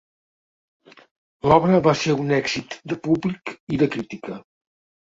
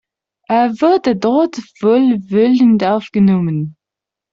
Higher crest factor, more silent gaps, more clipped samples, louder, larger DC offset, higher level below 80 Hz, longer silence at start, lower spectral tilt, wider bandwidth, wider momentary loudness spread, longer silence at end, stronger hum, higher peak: first, 22 dB vs 12 dB; first, 3.60-3.67 s vs none; neither; second, -21 LUFS vs -14 LUFS; neither; about the same, -54 dBFS vs -56 dBFS; first, 1.45 s vs 0.5 s; second, -6 dB/octave vs -8 dB/octave; about the same, 7.8 kHz vs 7.4 kHz; first, 16 LU vs 8 LU; about the same, 0.65 s vs 0.6 s; neither; about the same, -2 dBFS vs -2 dBFS